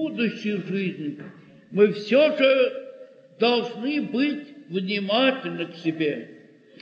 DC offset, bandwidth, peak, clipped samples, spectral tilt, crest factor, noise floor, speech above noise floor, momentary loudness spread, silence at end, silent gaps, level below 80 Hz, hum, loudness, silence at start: under 0.1%; 7.2 kHz; -6 dBFS; under 0.1%; -6.5 dB/octave; 18 dB; -46 dBFS; 23 dB; 15 LU; 0.45 s; none; -80 dBFS; none; -23 LUFS; 0 s